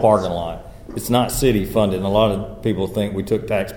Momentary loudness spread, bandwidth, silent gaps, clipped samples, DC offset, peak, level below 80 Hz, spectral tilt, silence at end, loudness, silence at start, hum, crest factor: 11 LU; 19 kHz; none; under 0.1%; 0.4%; -2 dBFS; -36 dBFS; -5.5 dB/octave; 0 s; -20 LUFS; 0 s; none; 18 dB